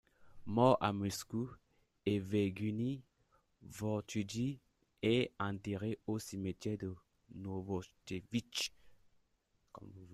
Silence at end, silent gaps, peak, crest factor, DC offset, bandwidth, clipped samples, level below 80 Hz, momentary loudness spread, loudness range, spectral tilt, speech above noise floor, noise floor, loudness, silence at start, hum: 0 s; none; -16 dBFS; 24 dB; under 0.1%; 14 kHz; under 0.1%; -70 dBFS; 16 LU; 7 LU; -5.5 dB/octave; 41 dB; -78 dBFS; -38 LUFS; 0.2 s; none